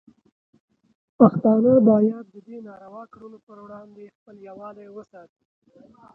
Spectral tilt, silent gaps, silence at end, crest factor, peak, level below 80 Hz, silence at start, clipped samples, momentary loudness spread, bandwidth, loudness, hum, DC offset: -12.5 dB/octave; 3.43-3.47 s, 4.15-4.26 s; 1.15 s; 22 dB; 0 dBFS; -64 dBFS; 1.2 s; under 0.1%; 27 LU; 1.7 kHz; -17 LUFS; none; under 0.1%